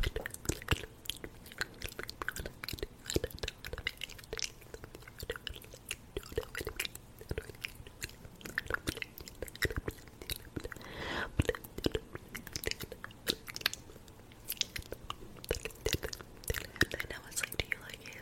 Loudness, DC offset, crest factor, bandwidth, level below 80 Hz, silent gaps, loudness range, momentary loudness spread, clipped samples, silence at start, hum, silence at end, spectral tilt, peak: -39 LUFS; under 0.1%; 32 dB; 16.5 kHz; -50 dBFS; none; 4 LU; 11 LU; under 0.1%; 0 s; none; 0 s; -3 dB/octave; -8 dBFS